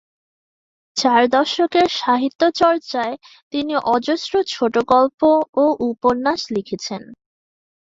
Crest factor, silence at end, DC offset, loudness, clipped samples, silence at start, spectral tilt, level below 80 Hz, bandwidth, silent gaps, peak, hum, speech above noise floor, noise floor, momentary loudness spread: 18 dB; 0.7 s; under 0.1%; -18 LUFS; under 0.1%; 0.95 s; -4 dB/octave; -58 dBFS; 7.8 kHz; 2.35-2.39 s, 3.42-3.51 s, 5.14-5.18 s, 5.49-5.53 s; -2 dBFS; none; over 72 dB; under -90 dBFS; 11 LU